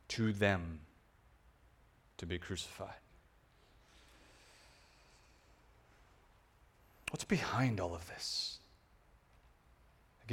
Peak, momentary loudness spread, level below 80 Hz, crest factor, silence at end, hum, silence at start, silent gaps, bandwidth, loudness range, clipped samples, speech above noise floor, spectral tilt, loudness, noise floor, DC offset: -18 dBFS; 28 LU; -62 dBFS; 26 dB; 0 s; none; 0.1 s; none; 17 kHz; 12 LU; under 0.1%; 30 dB; -5 dB/octave; -38 LUFS; -68 dBFS; under 0.1%